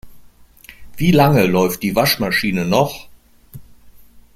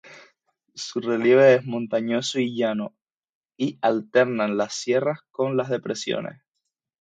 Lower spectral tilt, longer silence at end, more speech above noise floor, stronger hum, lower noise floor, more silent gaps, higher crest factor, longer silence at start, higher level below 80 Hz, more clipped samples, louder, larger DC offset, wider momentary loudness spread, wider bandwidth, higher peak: about the same, -5.5 dB/octave vs -5 dB/octave; second, 0.15 s vs 0.7 s; second, 29 dB vs 59 dB; neither; second, -44 dBFS vs -81 dBFS; second, none vs 3.14-3.18 s, 3.29-3.49 s; about the same, 18 dB vs 20 dB; about the same, 0.05 s vs 0.05 s; first, -42 dBFS vs -74 dBFS; neither; first, -16 LUFS vs -23 LUFS; neither; second, 7 LU vs 13 LU; first, 16.5 kHz vs 9.2 kHz; first, 0 dBFS vs -4 dBFS